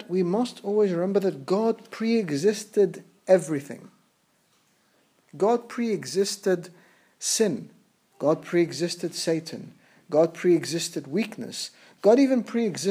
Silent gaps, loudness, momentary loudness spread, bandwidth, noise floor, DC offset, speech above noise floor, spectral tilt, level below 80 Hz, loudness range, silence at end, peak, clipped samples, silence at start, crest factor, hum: none; -25 LUFS; 10 LU; 16 kHz; -67 dBFS; under 0.1%; 42 dB; -5 dB/octave; -84 dBFS; 4 LU; 0 s; -6 dBFS; under 0.1%; 0 s; 20 dB; none